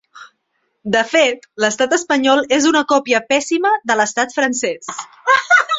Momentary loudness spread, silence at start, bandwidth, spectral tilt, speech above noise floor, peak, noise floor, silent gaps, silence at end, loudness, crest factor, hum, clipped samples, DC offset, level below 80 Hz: 8 LU; 0.15 s; 8.2 kHz; -2 dB/octave; 53 dB; 0 dBFS; -68 dBFS; none; 0 s; -15 LUFS; 16 dB; none; under 0.1%; under 0.1%; -62 dBFS